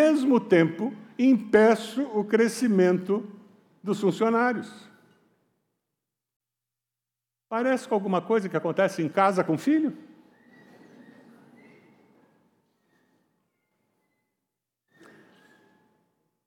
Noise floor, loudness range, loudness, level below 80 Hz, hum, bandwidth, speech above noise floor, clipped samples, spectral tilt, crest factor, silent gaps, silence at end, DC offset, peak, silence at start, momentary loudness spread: -89 dBFS; 10 LU; -24 LUFS; -80 dBFS; none; 15.5 kHz; 65 dB; under 0.1%; -6.5 dB/octave; 18 dB; 6.36-6.40 s; 6.45 s; under 0.1%; -8 dBFS; 0 s; 12 LU